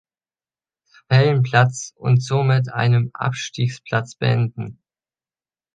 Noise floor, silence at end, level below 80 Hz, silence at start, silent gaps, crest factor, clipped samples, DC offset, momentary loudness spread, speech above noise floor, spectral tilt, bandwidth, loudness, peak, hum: under -90 dBFS; 1.05 s; -58 dBFS; 1.1 s; none; 18 dB; under 0.1%; under 0.1%; 9 LU; over 71 dB; -6 dB/octave; 9.2 kHz; -19 LUFS; -2 dBFS; none